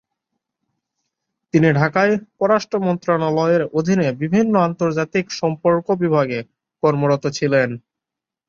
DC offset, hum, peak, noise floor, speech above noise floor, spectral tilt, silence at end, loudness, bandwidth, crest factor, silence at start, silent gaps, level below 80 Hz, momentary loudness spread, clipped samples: under 0.1%; none; -2 dBFS; -86 dBFS; 69 dB; -7 dB/octave; 0.7 s; -18 LUFS; 7.6 kHz; 18 dB; 1.55 s; none; -58 dBFS; 5 LU; under 0.1%